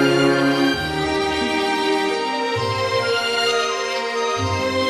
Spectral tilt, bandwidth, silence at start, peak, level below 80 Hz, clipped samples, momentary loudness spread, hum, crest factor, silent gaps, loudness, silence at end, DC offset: -4 dB/octave; 13 kHz; 0 s; -4 dBFS; -46 dBFS; under 0.1%; 5 LU; none; 16 dB; none; -20 LUFS; 0 s; under 0.1%